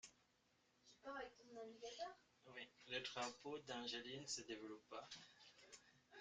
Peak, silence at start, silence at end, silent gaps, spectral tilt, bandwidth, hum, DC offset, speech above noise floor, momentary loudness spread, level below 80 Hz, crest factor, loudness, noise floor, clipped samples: -34 dBFS; 0.05 s; 0 s; none; -2 dB/octave; 9 kHz; none; under 0.1%; 29 dB; 16 LU; -88 dBFS; 22 dB; -53 LUFS; -81 dBFS; under 0.1%